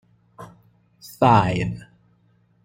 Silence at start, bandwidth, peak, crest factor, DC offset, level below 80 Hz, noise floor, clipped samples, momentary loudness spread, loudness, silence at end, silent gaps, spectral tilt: 0.4 s; 16.5 kHz; -4 dBFS; 20 dB; under 0.1%; -50 dBFS; -61 dBFS; under 0.1%; 22 LU; -19 LUFS; 0.85 s; none; -7 dB/octave